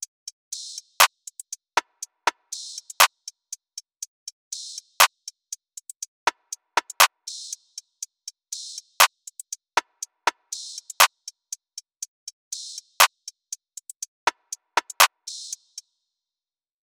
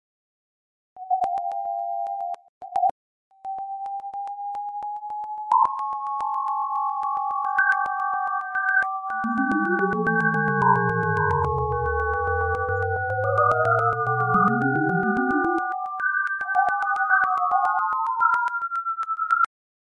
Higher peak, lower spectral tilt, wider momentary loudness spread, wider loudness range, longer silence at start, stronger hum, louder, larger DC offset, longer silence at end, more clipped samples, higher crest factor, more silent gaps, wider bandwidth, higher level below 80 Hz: first, -2 dBFS vs -6 dBFS; second, 3 dB/octave vs -8.5 dB/octave; first, 21 LU vs 12 LU; second, 3 LU vs 7 LU; second, 0.5 s vs 0.95 s; neither; about the same, -22 LUFS vs -23 LUFS; neither; first, 1.3 s vs 0.55 s; neither; first, 26 dB vs 18 dB; first, 4.08-4.26 s, 4.32-4.51 s, 5.96-6.00 s, 6.08-6.26 s, 12.08-12.26 s, 12.33-12.51 s, 13.96-14.00 s, 14.08-14.27 s vs 2.49-2.61 s, 2.91-3.31 s; first, over 20 kHz vs 11 kHz; second, -72 dBFS vs -50 dBFS